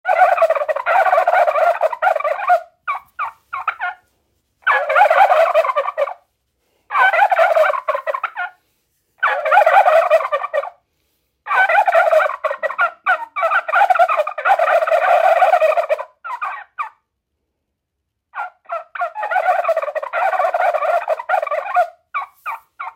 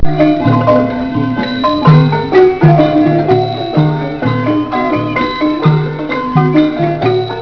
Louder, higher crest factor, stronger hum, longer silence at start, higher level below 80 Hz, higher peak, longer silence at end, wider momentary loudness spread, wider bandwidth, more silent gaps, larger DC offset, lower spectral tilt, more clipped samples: second, -16 LUFS vs -11 LUFS; first, 18 dB vs 10 dB; neither; about the same, 0.05 s vs 0 s; second, -74 dBFS vs -32 dBFS; about the same, 0 dBFS vs 0 dBFS; about the same, 0.05 s vs 0 s; first, 14 LU vs 7 LU; first, 16 kHz vs 5.4 kHz; neither; neither; second, 0 dB/octave vs -9 dB/octave; second, under 0.1% vs 0.4%